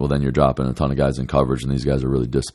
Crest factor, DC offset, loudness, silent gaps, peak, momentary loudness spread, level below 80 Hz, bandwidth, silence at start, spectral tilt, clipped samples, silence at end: 18 dB; under 0.1%; -20 LUFS; none; -2 dBFS; 3 LU; -32 dBFS; 12 kHz; 0 s; -7.5 dB/octave; under 0.1%; 0.05 s